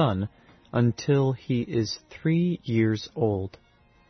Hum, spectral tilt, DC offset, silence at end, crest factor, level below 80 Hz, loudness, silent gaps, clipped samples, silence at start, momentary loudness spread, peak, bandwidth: none; -7 dB/octave; under 0.1%; 0.6 s; 14 dB; -58 dBFS; -26 LUFS; none; under 0.1%; 0 s; 8 LU; -12 dBFS; 6.4 kHz